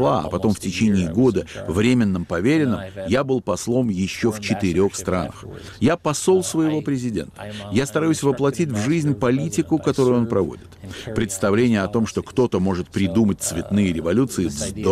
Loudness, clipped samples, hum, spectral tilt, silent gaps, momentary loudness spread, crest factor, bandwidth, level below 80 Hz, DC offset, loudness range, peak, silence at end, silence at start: -21 LUFS; under 0.1%; none; -6 dB/octave; none; 7 LU; 12 dB; 15.5 kHz; -46 dBFS; under 0.1%; 2 LU; -8 dBFS; 0 s; 0 s